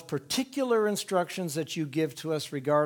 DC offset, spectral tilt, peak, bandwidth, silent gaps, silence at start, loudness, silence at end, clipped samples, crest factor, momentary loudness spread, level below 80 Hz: under 0.1%; -4.5 dB/octave; -12 dBFS; 19.5 kHz; none; 0 s; -30 LUFS; 0 s; under 0.1%; 16 dB; 6 LU; -72 dBFS